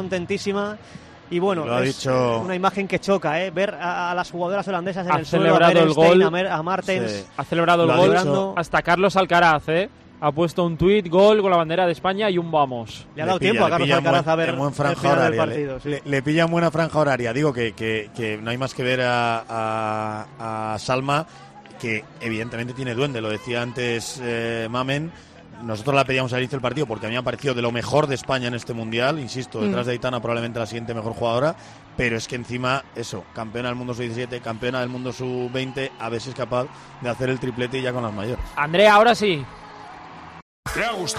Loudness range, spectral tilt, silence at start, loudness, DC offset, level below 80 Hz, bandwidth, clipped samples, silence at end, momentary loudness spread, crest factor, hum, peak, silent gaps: 8 LU; -5.5 dB/octave; 0 s; -22 LUFS; under 0.1%; -50 dBFS; 13 kHz; under 0.1%; 0 s; 13 LU; 16 dB; none; -4 dBFS; 40.42-40.63 s